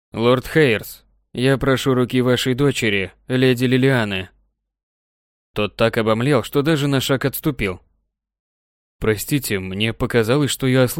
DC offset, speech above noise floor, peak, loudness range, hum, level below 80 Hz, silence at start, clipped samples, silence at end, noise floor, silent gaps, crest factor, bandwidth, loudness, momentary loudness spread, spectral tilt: under 0.1%; 51 dB; -2 dBFS; 4 LU; none; -44 dBFS; 0.15 s; under 0.1%; 0 s; -69 dBFS; 4.83-5.54 s, 8.39-8.99 s; 16 dB; 17 kHz; -19 LUFS; 8 LU; -5.5 dB/octave